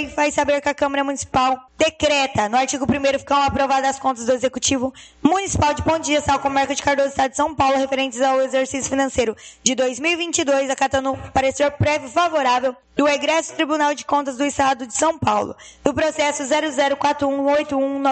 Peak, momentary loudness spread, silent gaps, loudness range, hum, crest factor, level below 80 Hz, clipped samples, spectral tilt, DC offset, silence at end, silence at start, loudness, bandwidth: 0 dBFS; 4 LU; none; 1 LU; none; 20 dB; -44 dBFS; under 0.1%; -3.5 dB/octave; under 0.1%; 0 s; 0 s; -19 LUFS; 9 kHz